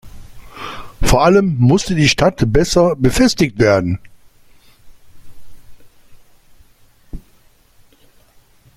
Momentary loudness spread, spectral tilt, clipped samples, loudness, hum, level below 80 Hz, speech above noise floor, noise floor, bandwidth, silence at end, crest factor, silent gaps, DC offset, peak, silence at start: 16 LU; -5.5 dB/octave; under 0.1%; -14 LUFS; none; -30 dBFS; 37 dB; -50 dBFS; 16 kHz; 1.6 s; 16 dB; none; under 0.1%; 0 dBFS; 0.05 s